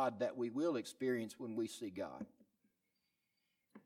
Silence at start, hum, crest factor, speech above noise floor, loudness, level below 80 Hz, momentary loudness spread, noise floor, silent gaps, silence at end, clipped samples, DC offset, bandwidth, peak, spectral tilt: 0 s; none; 18 dB; 44 dB; -42 LUFS; -86 dBFS; 9 LU; -86 dBFS; none; 0.05 s; under 0.1%; under 0.1%; 15.5 kHz; -24 dBFS; -5.5 dB/octave